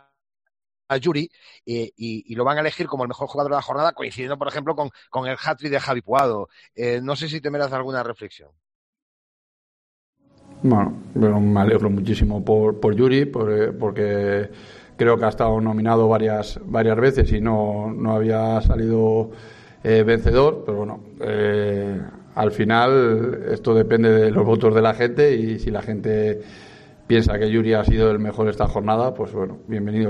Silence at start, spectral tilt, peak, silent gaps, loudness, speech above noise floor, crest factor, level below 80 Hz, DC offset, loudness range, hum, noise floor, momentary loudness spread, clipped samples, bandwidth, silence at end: 0.9 s; -8 dB/octave; -6 dBFS; 8.75-8.93 s, 9.02-10.13 s; -20 LUFS; over 71 dB; 14 dB; -34 dBFS; under 0.1%; 7 LU; none; under -90 dBFS; 11 LU; under 0.1%; 9.2 kHz; 0 s